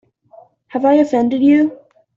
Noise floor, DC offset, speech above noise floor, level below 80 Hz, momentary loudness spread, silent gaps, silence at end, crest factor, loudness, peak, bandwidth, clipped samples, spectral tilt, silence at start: -46 dBFS; under 0.1%; 34 dB; -60 dBFS; 7 LU; none; 0.45 s; 14 dB; -14 LUFS; -2 dBFS; 7.4 kHz; under 0.1%; -7 dB/octave; 0.75 s